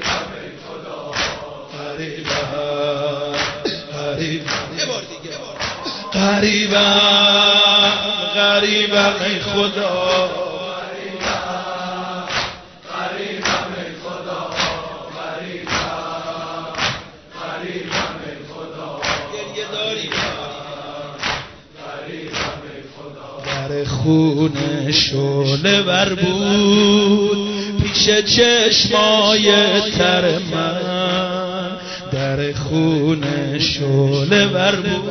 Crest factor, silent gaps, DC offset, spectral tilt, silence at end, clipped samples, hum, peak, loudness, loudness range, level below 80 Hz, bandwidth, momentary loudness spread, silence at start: 16 dB; none; under 0.1%; -4 dB/octave; 0 s; under 0.1%; none; -2 dBFS; -17 LUFS; 12 LU; -44 dBFS; 6.4 kHz; 18 LU; 0 s